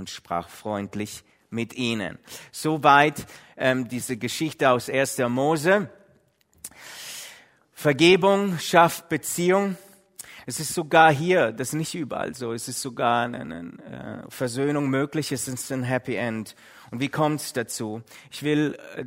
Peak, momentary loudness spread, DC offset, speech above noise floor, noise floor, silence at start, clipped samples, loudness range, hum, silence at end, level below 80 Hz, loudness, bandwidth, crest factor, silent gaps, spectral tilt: 0 dBFS; 21 LU; under 0.1%; 38 dB; -62 dBFS; 0 s; under 0.1%; 6 LU; none; 0 s; -64 dBFS; -23 LUFS; 16 kHz; 24 dB; none; -4.5 dB/octave